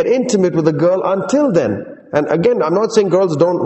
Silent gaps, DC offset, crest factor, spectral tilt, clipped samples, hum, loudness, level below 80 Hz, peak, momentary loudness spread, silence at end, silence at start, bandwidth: none; under 0.1%; 14 dB; -6.5 dB/octave; under 0.1%; none; -15 LUFS; -54 dBFS; 0 dBFS; 5 LU; 0 s; 0 s; 8.4 kHz